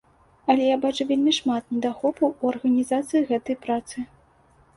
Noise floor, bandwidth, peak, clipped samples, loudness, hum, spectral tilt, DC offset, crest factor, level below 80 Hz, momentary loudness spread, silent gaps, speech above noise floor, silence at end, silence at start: -58 dBFS; 11.5 kHz; -6 dBFS; under 0.1%; -23 LUFS; none; -4 dB/octave; under 0.1%; 18 dB; -62 dBFS; 8 LU; none; 35 dB; 0.7 s; 0.45 s